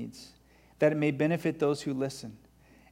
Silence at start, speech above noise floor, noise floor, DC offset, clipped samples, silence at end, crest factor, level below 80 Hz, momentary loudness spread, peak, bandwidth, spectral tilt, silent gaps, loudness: 0 s; 31 dB; -60 dBFS; under 0.1%; under 0.1%; 0.55 s; 18 dB; -66 dBFS; 17 LU; -14 dBFS; 16 kHz; -6.5 dB/octave; none; -29 LUFS